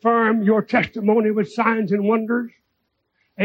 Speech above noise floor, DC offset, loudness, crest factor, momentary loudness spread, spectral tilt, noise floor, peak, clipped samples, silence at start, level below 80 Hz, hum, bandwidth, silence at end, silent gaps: 54 dB; under 0.1%; -19 LUFS; 16 dB; 6 LU; -8 dB/octave; -72 dBFS; -4 dBFS; under 0.1%; 0.05 s; -66 dBFS; none; 7.6 kHz; 0 s; none